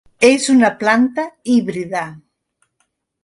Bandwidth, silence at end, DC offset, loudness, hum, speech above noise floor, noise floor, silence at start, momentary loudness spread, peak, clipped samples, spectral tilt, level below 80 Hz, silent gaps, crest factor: 11.5 kHz; 1.05 s; under 0.1%; -15 LUFS; none; 53 dB; -68 dBFS; 0.2 s; 11 LU; 0 dBFS; under 0.1%; -4 dB/octave; -58 dBFS; none; 16 dB